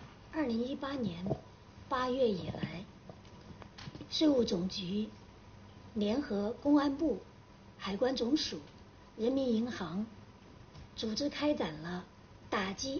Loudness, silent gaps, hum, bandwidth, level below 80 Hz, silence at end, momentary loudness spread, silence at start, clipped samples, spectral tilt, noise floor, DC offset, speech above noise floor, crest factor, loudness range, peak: -35 LUFS; none; none; 6.8 kHz; -60 dBFS; 0 s; 24 LU; 0 s; under 0.1%; -4.5 dB/octave; -56 dBFS; under 0.1%; 22 dB; 18 dB; 4 LU; -18 dBFS